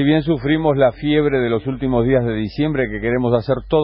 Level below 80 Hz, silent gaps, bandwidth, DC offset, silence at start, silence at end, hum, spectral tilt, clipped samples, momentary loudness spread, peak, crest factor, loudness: -36 dBFS; none; 5.8 kHz; under 0.1%; 0 s; 0 s; none; -12.5 dB/octave; under 0.1%; 5 LU; -2 dBFS; 14 dB; -18 LUFS